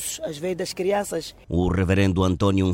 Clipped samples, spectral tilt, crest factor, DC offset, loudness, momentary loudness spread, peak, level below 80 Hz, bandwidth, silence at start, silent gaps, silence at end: under 0.1%; -6 dB/octave; 16 dB; under 0.1%; -23 LUFS; 9 LU; -6 dBFS; -42 dBFS; 16.5 kHz; 0 s; none; 0 s